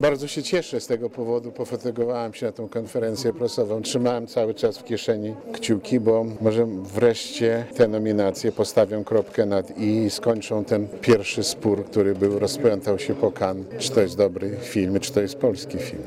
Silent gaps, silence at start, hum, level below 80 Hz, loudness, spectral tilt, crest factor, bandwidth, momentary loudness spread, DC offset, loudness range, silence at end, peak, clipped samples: none; 0 s; none; -60 dBFS; -23 LUFS; -5.5 dB/octave; 16 dB; 15.5 kHz; 7 LU; under 0.1%; 4 LU; 0 s; -6 dBFS; under 0.1%